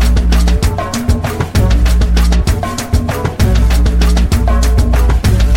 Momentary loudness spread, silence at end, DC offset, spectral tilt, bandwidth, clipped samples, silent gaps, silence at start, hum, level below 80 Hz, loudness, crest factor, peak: 4 LU; 0 s; under 0.1%; -6 dB/octave; 16.5 kHz; under 0.1%; none; 0 s; none; -12 dBFS; -13 LUFS; 10 dB; 0 dBFS